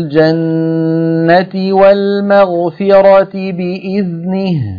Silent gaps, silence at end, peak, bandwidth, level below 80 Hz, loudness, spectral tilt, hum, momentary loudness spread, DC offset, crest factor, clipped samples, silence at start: none; 0 s; 0 dBFS; 5.2 kHz; -50 dBFS; -11 LUFS; -9.5 dB/octave; none; 9 LU; under 0.1%; 10 dB; 0.2%; 0 s